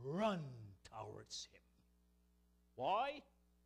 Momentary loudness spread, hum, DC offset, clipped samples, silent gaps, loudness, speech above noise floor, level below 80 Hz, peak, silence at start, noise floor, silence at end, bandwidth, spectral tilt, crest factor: 17 LU; 60 Hz at -75 dBFS; under 0.1%; under 0.1%; none; -44 LUFS; 31 dB; -74 dBFS; -26 dBFS; 0 s; -75 dBFS; 0.4 s; 13.5 kHz; -5 dB/octave; 20 dB